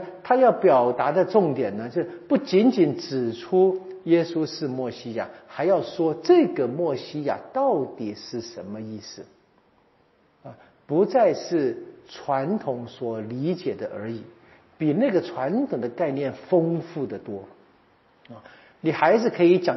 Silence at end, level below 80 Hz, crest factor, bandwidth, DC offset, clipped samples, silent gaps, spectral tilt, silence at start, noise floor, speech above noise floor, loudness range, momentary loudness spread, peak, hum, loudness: 0 s; -72 dBFS; 20 dB; 6 kHz; under 0.1%; under 0.1%; none; -6 dB/octave; 0 s; -62 dBFS; 39 dB; 7 LU; 16 LU; -4 dBFS; none; -23 LUFS